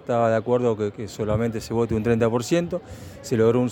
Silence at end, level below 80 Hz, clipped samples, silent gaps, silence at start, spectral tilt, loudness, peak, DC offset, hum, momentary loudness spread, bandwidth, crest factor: 0 s; -46 dBFS; under 0.1%; none; 0.05 s; -7 dB/octave; -23 LUFS; -6 dBFS; under 0.1%; none; 10 LU; 17 kHz; 16 dB